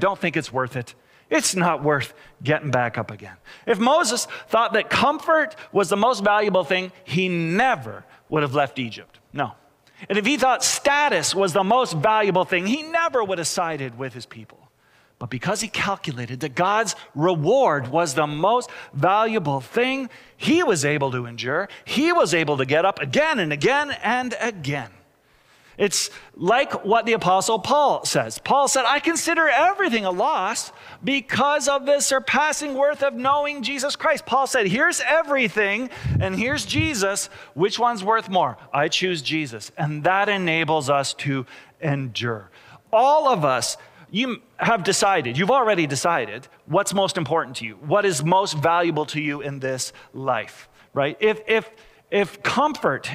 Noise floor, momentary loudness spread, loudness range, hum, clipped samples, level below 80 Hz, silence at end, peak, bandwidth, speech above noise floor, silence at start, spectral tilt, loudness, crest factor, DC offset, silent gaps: -59 dBFS; 10 LU; 4 LU; none; under 0.1%; -54 dBFS; 0 s; -6 dBFS; 16.5 kHz; 37 dB; 0 s; -3.5 dB/octave; -21 LUFS; 16 dB; under 0.1%; none